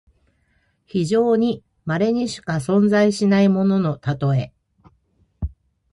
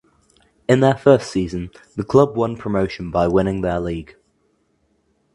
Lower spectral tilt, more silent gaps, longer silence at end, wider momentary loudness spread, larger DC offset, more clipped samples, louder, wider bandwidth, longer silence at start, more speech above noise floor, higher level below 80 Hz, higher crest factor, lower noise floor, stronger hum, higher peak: about the same, -7 dB/octave vs -7 dB/octave; neither; second, 0.45 s vs 1.3 s; about the same, 16 LU vs 15 LU; neither; neither; about the same, -19 LUFS vs -19 LUFS; about the same, 11.5 kHz vs 11.5 kHz; first, 0.95 s vs 0.7 s; about the same, 46 dB vs 46 dB; about the same, -44 dBFS vs -42 dBFS; second, 14 dB vs 20 dB; about the same, -65 dBFS vs -64 dBFS; neither; second, -6 dBFS vs 0 dBFS